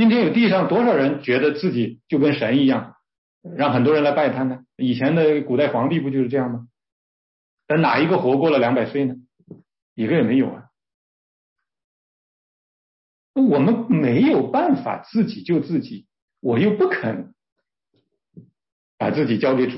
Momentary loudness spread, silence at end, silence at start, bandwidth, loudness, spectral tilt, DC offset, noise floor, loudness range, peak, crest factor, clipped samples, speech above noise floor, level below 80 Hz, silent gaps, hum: 9 LU; 0 s; 0 s; 5.8 kHz; -20 LUFS; -11.5 dB/octave; under 0.1%; -70 dBFS; 6 LU; -6 dBFS; 14 dB; under 0.1%; 51 dB; -66 dBFS; 3.18-3.41 s, 6.92-7.57 s, 9.82-9.96 s, 10.94-11.56 s, 11.84-13.34 s, 16.22-16.28 s, 17.52-17.56 s, 18.72-18.98 s; none